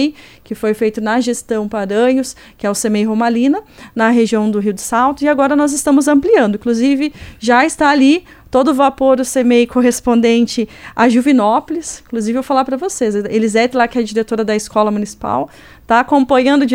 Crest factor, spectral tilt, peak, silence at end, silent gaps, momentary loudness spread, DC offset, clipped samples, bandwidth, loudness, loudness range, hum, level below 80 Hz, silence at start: 14 dB; -4.5 dB/octave; 0 dBFS; 0 s; none; 9 LU; under 0.1%; under 0.1%; 16.5 kHz; -14 LUFS; 3 LU; none; -46 dBFS; 0 s